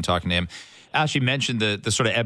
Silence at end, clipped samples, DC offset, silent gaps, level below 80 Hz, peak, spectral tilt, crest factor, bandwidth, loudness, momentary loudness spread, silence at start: 0 s; under 0.1%; under 0.1%; none; -48 dBFS; -8 dBFS; -4 dB/octave; 16 dB; 11 kHz; -23 LUFS; 7 LU; 0 s